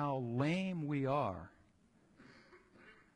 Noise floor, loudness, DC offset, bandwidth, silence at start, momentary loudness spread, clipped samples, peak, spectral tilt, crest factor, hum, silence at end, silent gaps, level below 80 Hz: -70 dBFS; -37 LUFS; under 0.1%; 10.5 kHz; 0 s; 11 LU; under 0.1%; -24 dBFS; -7.5 dB/octave; 16 dB; none; 0.2 s; none; -70 dBFS